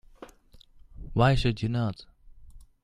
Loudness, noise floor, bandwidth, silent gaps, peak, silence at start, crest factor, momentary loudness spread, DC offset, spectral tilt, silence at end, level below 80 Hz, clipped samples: -27 LUFS; -55 dBFS; 11.5 kHz; none; -8 dBFS; 0.2 s; 22 dB; 20 LU; under 0.1%; -7 dB/octave; 0.2 s; -42 dBFS; under 0.1%